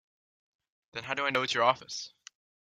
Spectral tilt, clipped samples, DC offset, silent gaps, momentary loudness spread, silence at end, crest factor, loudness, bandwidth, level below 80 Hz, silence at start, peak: -2.5 dB/octave; under 0.1%; under 0.1%; none; 16 LU; 0.55 s; 24 dB; -29 LUFS; 13.5 kHz; -76 dBFS; 0.95 s; -10 dBFS